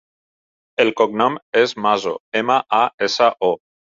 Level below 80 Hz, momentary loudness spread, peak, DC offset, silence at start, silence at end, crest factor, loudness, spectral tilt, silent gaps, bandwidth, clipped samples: -66 dBFS; 5 LU; -2 dBFS; under 0.1%; 0.8 s; 0.4 s; 18 dB; -18 LUFS; -4 dB/octave; 1.42-1.53 s, 2.20-2.32 s, 2.94-2.98 s; 7.6 kHz; under 0.1%